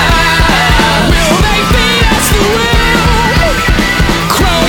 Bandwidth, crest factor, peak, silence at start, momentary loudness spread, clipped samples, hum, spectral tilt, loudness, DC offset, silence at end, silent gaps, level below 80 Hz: over 20 kHz; 8 dB; 0 dBFS; 0 s; 2 LU; 0.4%; none; -4 dB/octave; -8 LUFS; under 0.1%; 0 s; none; -14 dBFS